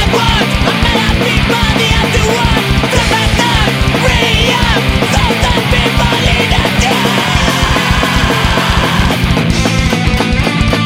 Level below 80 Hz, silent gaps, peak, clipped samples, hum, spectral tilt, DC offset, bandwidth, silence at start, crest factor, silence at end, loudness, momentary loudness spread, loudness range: -18 dBFS; none; 0 dBFS; under 0.1%; none; -4.5 dB/octave; under 0.1%; 16.5 kHz; 0 s; 10 dB; 0 s; -10 LUFS; 2 LU; 1 LU